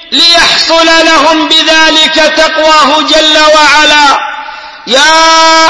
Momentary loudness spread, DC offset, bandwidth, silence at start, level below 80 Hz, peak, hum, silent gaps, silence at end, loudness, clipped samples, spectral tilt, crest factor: 6 LU; 2%; 11 kHz; 0 s; -36 dBFS; 0 dBFS; none; none; 0 s; -3 LUFS; 5%; 0 dB/octave; 6 dB